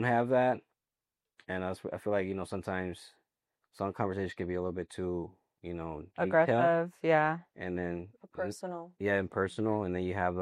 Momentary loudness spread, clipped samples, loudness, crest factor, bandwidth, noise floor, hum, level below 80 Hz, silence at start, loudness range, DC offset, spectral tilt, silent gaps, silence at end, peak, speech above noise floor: 14 LU; under 0.1%; -33 LUFS; 20 dB; 12.5 kHz; under -90 dBFS; none; -64 dBFS; 0 s; 7 LU; under 0.1%; -7 dB/octave; none; 0 s; -12 dBFS; over 58 dB